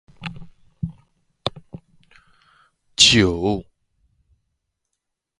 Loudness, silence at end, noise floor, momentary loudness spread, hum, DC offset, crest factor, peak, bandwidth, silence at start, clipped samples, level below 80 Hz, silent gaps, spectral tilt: -17 LUFS; 1.75 s; -80 dBFS; 23 LU; none; under 0.1%; 24 dB; 0 dBFS; 11.5 kHz; 0.2 s; under 0.1%; -44 dBFS; none; -3 dB/octave